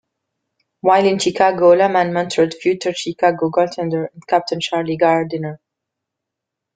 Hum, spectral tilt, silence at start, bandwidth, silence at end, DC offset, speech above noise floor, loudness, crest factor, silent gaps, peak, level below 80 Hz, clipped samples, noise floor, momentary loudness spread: none; -5 dB/octave; 0.85 s; 9.4 kHz; 1.2 s; under 0.1%; 66 dB; -17 LUFS; 16 dB; none; -2 dBFS; -62 dBFS; under 0.1%; -82 dBFS; 9 LU